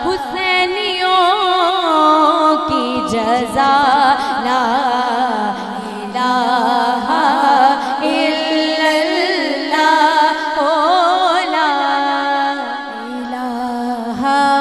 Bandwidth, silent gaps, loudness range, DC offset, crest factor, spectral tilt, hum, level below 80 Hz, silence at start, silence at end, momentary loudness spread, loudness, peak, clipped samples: 13.5 kHz; none; 3 LU; 0.2%; 14 dB; -3.5 dB/octave; none; -52 dBFS; 0 s; 0 s; 9 LU; -14 LUFS; 0 dBFS; under 0.1%